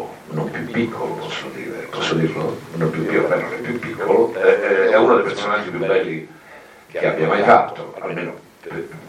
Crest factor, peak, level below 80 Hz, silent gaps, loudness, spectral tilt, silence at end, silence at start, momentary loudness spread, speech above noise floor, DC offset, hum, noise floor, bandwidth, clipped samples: 20 dB; 0 dBFS; -60 dBFS; none; -19 LUFS; -6 dB/octave; 0 s; 0 s; 16 LU; 24 dB; under 0.1%; none; -43 dBFS; 14 kHz; under 0.1%